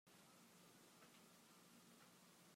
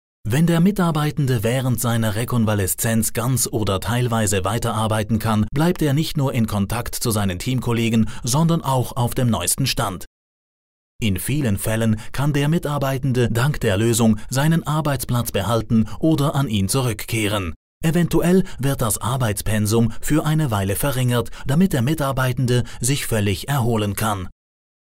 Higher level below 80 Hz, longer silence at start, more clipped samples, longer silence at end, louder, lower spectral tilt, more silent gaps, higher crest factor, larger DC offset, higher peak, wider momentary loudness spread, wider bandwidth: second, under -90 dBFS vs -36 dBFS; second, 0.05 s vs 0.25 s; neither; second, 0 s vs 0.5 s; second, -68 LUFS vs -20 LUFS; second, -3 dB/octave vs -5.5 dB/octave; second, none vs 10.07-10.99 s, 17.56-17.81 s; about the same, 14 dB vs 14 dB; neither; second, -54 dBFS vs -6 dBFS; second, 1 LU vs 4 LU; about the same, 16 kHz vs 16.5 kHz